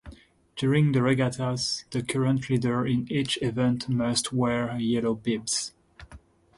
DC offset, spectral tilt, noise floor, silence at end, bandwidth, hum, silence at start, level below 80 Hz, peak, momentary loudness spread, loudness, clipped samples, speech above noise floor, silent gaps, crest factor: under 0.1%; -5 dB/octave; -51 dBFS; 0.4 s; 11.5 kHz; none; 0.05 s; -56 dBFS; -10 dBFS; 6 LU; -26 LUFS; under 0.1%; 26 dB; none; 16 dB